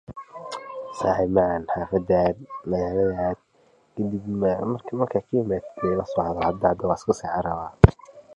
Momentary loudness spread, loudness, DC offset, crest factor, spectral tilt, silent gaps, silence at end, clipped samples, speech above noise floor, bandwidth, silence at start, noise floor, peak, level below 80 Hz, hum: 14 LU; -24 LUFS; under 0.1%; 24 dB; -8 dB/octave; none; 0 s; under 0.1%; 37 dB; 11 kHz; 0.1 s; -60 dBFS; 0 dBFS; -38 dBFS; none